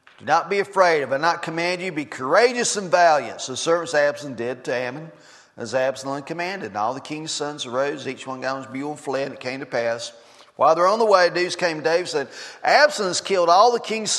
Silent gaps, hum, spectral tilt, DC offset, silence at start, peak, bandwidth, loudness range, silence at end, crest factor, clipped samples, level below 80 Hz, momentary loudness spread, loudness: none; none; -3 dB/octave; under 0.1%; 0.2 s; -2 dBFS; 12.5 kHz; 8 LU; 0 s; 20 dB; under 0.1%; -74 dBFS; 13 LU; -21 LUFS